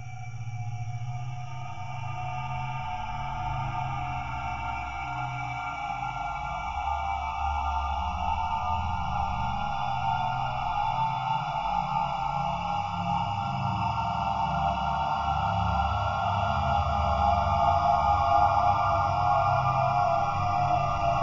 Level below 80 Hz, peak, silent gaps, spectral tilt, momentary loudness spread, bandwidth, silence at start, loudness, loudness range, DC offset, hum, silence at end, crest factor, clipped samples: -40 dBFS; -12 dBFS; none; -6.5 dB/octave; 10 LU; 7.6 kHz; 0 s; -28 LUFS; 9 LU; 0.4%; none; 0 s; 16 dB; under 0.1%